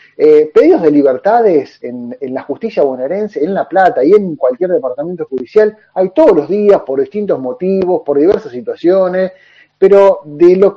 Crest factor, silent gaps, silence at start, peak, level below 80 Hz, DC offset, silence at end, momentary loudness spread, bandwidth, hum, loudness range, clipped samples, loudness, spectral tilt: 10 dB; none; 0.2 s; 0 dBFS; -54 dBFS; under 0.1%; 0 s; 12 LU; 6.6 kHz; none; 2 LU; 0.7%; -11 LUFS; -8.5 dB/octave